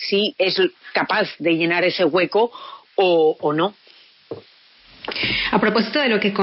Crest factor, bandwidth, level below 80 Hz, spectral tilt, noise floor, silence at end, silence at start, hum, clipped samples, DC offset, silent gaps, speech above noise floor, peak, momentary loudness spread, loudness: 16 dB; 5.8 kHz; -54 dBFS; -2.5 dB/octave; -51 dBFS; 0 s; 0 s; none; under 0.1%; under 0.1%; none; 32 dB; -4 dBFS; 15 LU; -19 LUFS